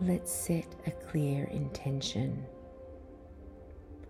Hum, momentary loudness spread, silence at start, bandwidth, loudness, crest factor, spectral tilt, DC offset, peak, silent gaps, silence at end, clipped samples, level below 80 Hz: none; 19 LU; 0 s; 18 kHz; -35 LUFS; 18 dB; -5.5 dB/octave; under 0.1%; -18 dBFS; none; 0 s; under 0.1%; -54 dBFS